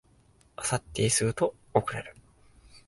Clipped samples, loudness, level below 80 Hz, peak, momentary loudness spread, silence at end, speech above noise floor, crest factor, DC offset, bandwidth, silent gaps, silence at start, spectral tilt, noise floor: under 0.1%; -29 LUFS; -56 dBFS; -6 dBFS; 16 LU; 0.1 s; 34 dB; 24 dB; under 0.1%; 12 kHz; none; 0.6 s; -4 dB/octave; -62 dBFS